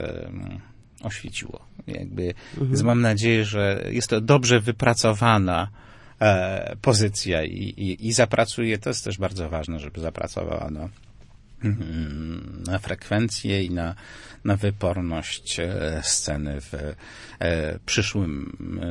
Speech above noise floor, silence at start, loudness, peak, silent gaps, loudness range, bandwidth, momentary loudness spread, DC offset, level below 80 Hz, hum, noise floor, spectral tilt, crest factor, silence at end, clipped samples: 24 dB; 0 s; -24 LUFS; -2 dBFS; none; 9 LU; 11.5 kHz; 15 LU; under 0.1%; -44 dBFS; none; -48 dBFS; -4.5 dB/octave; 22 dB; 0 s; under 0.1%